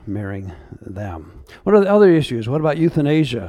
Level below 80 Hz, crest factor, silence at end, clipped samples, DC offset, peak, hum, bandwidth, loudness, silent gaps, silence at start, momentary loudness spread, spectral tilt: -46 dBFS; 18 dB; 0 s; under 0.1%; under 0.1%; 0 dBFS; none; 12 kHz; -16 LUFS; none; 0.05 s; 22 LU; -8 dB/octave